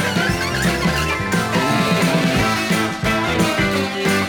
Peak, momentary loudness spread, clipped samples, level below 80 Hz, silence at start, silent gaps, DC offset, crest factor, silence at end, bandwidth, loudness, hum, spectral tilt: -4 dBFS; 3 LU; under 0.1%; -36 dBFS; 0 s; none; under 0.1%; 14 dB; 0 s; 19.5 kHz; -18 LUFS; none; -4.5 dB/octave